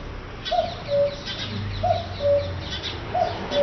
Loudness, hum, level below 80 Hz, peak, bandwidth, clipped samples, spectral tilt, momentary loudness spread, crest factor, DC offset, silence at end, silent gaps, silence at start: -26 LUFS; none; -40 dBFS; -10 dBFS; 6.4 kHz; under 0.1%; -3.5 dB/octave; 7 LU; 16 dB; under 0.1%; 0 s; none; 0 s